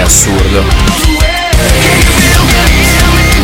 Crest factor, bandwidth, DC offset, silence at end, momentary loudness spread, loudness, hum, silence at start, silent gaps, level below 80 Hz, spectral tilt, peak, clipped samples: 6 dB; over 20 kHz; under 0.1%; 0 s; 3 LU; -7 LUFS; none; 0 s; none; -10 dBFS; -3.5 dB/octave; 0 dBFS; 1%